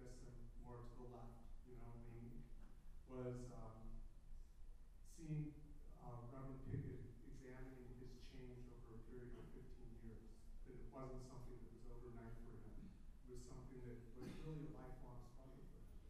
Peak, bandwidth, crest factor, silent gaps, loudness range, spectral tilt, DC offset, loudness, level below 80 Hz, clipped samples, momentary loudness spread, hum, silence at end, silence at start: -36 dBFS; 13 kHz; 20 dB; none; 5 LU; -7.5 dB/octave; under 0.1%; -58 LUFS; -58 dBFS; under 0.1%; 13 LU; none; 0 s; 0 s